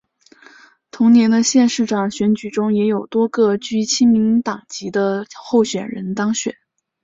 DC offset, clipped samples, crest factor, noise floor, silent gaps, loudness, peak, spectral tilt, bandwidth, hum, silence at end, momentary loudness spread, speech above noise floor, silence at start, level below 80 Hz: under 0.1%; under 0.1%; 14 dB; -48 dBFS; none; -17 LUFS; -4 dBFS; -4.5 dB/octave; 7.8 kHz; none; 0.5 s; 11 LU; 32 dB; 0.95 s; -60 dBFS